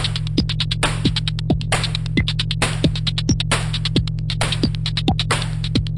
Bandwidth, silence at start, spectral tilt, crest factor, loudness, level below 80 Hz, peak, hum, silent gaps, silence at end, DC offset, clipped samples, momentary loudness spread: 11.5 kHz; 0 s; -4.5 dB/octave; 16 dB; -20 LUFS; -30 dBFS; -4 dBFS; none; none; 0 s; under 0.1%; under 0.1%; 3 LU